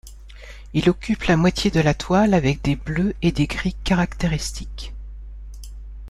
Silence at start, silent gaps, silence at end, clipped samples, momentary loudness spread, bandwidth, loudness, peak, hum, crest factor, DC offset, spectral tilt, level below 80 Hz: 0.05 s; none; 0 s; under 0.1%; 21 LU; 12.5 kHz; -21 LUFS; -4 dBFS; 50 Hz at -35 dBFS; 18 dB; under 0.1%; -6 dB/octave; -34 dBFS